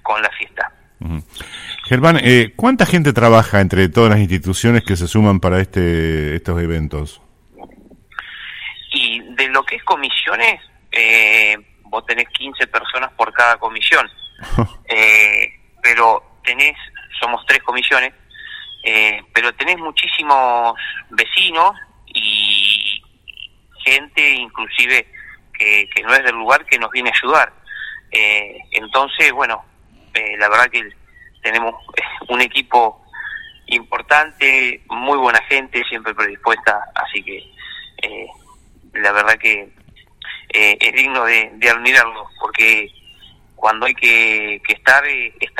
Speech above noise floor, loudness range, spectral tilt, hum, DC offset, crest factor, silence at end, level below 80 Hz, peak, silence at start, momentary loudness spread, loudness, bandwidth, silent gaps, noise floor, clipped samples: 32 dB; 6 LU; -4.5 dB/octave; none; under 0.1%; 16 dB; 0 s; -40 dBFS; 0 dBFS; 0.05 s; 17 LU; -14 LUFS; 16.5 kHz; none; -47 dBFS; under 0.1%